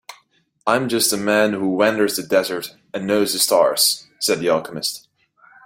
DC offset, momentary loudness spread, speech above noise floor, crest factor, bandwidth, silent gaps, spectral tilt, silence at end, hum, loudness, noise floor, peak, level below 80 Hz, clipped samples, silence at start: under 0.1%; 11 LU; 41 dB; 18 dB; 16.5 kHz; none; -2.5 dB/octave; 0.7 s; none; -19 LUFS; -60 dBFS; -2 dBFS; -62 dBFS; under 0.1%; 0.1 s